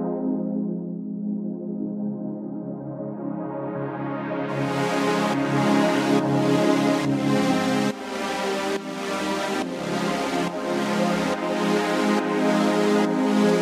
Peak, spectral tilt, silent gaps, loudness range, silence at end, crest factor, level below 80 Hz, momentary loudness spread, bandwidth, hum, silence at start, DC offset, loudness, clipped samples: -8 dBFS; -5.5 dB/octave; none; 8 LU; 0 s; 16 dB; -64 dBFS; 10 LU; 15.5 kHz; none; 0 s; under 0.1%; -24 LUFS; under 0.1%